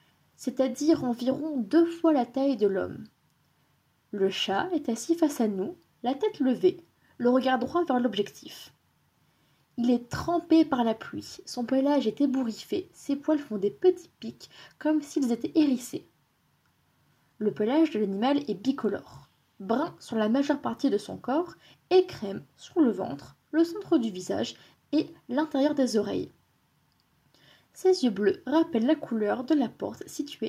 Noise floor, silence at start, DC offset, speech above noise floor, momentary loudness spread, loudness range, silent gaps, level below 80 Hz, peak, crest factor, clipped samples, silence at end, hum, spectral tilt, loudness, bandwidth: -69 dBFS; 0.4 s; under 0.1%; 42 dB; 13 LU; 3 LU; none; -68 dBFS; -12 dBFS; 16 dB; under 0.1%; 0 s; none; -5.5 dB/octave; -27 LUFS; 15.5 kHz